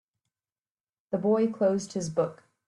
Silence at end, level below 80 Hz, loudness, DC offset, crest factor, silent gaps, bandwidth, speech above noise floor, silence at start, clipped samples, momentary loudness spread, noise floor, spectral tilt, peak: 0.35 s; -70 dBFS; -28 LUFS; under 0.1%; 16 dB; none; 11.5 kHz; over 63 dB; 1.1 s; under 0.1%; 7 LU; under -90 dBFS; -6.5 dB/octave; -14 dBFS